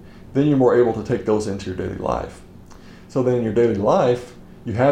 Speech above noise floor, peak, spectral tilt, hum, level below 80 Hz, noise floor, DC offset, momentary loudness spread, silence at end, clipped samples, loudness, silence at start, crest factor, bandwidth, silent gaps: 23 dB; -4 dBFS; -7.5 dB/octave; none; -46 dBFS; -42 dBFS; under 0.1%; 12 LU; 0 s; under 0.1%; -20 LUFS; 0 s; 16 dB; 10.5 kHz; none